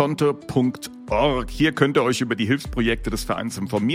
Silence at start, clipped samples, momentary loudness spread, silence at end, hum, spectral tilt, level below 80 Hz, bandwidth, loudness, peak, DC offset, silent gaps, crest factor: 0 s; under 0.1%; 7 LU; 0 s; none; -5.5 dB/octave; -38 dBFS; 16 kHz; -22 LUFS; -2 dBFS; under 0.1%; none; 20 dB